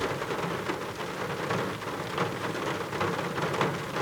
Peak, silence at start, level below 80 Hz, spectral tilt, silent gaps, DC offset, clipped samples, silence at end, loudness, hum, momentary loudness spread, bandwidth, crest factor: -12 dBFS; 0 s; -60 dBFS; -5 dB/octave; none; under 0.1%; under 0.1%; 0 s; -31 LUFS; none; 4 LU; over 20 kHz; 20 dB